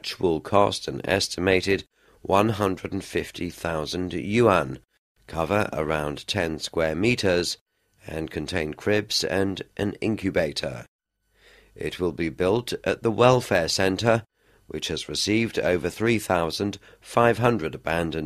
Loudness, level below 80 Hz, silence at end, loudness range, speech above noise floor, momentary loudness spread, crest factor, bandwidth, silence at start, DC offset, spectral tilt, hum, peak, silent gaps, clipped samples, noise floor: -24 LUFS; -50 dBFS; 0 s; 4 LU; 37 dB; 11 LU; 22 dB; 13.5 kHz; 0.05 s; under 0.1%; -5 dB/octave; none; -2 dBFS; 4.99-5.15 s, 7.61-7.66 s, 10.88-10.99 s; under 0.1%; -61 dBFS